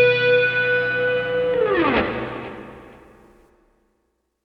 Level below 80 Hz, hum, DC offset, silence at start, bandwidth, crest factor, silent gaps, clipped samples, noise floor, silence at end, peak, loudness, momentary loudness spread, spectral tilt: -48 dBFS; none; under 0.1%; 0 s; 5.8 kHz; 16 dB; none; under 0.1%; -71 dBFS; 1.5 s; -6 dBFS; -19 LUFS; 17 LU; -7 dB/octave